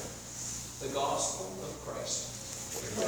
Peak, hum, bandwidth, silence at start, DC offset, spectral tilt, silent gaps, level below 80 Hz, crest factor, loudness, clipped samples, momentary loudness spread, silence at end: -20 dBFS; 60 Hz at -55 dBFS; over 20 kHz; 0 s; under 0.1%; -2.5 dB/octave; none; -58 dBFS; 18 dB; -36 LUFS; under 0.1%; 9 LU; 0 s